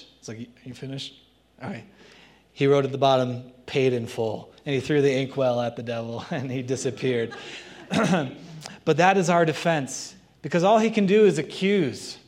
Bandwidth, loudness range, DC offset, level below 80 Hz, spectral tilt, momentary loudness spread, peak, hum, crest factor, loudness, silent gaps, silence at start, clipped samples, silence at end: 13 kHz; 5 LU; under 0.1%; -66 dBFS; -5.5 dB/octave; 20 LU; -4 dBFS; none; 20 dB; -24 LUFS; none; 0 s; under 0.1%; 0.1 s